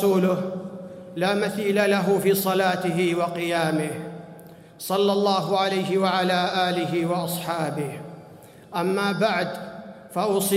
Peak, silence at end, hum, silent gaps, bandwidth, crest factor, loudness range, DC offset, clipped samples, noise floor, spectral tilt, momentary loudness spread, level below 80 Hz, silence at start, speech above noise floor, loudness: -8 dBFS; 0 s; none; none; 16 kHz; 14 dB; 4 LU; under 0.1%; under 0.1%; -46 dBFS; -5 dB/octave; 16 LU; -68 dBFS; 0 s; 24 dB; -23 LUFS